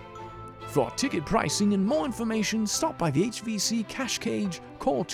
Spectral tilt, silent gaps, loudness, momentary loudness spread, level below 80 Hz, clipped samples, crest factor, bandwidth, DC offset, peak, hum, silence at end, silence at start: -4 dB/octave; none; -27 LUFS; 7 LU; -52 dBFS; under 0.1%; 16 dB; 18.5 kHz; under 0.1%; -10 dBFS; none; 0 s; 0 s